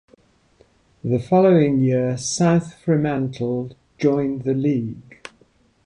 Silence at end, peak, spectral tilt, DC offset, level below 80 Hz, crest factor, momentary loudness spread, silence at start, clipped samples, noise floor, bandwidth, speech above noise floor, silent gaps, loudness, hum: 0.85 s; -6 dBFS; -6.5 dB/octave; under 0.1%; -56 dBFS; 16 dB; 17 LU; 1.05 s; under 0.1%; -58 dBFS; 11 kHz; 39 dB; none; -20 LUFS; none